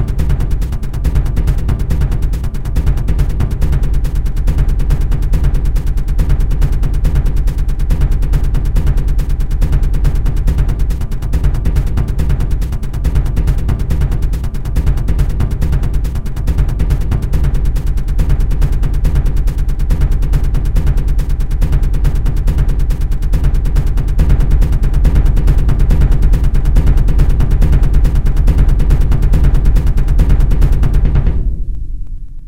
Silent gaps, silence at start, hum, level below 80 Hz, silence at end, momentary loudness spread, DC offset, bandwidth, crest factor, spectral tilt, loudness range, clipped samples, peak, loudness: none; 0 s; none; -12 dBFS; 0 s; 5 LU; 6%; 13 kHz; 12 dB; -7.5 dB/octave; 3 LU; under 0.1%; 0 dBFS; -16 LUFS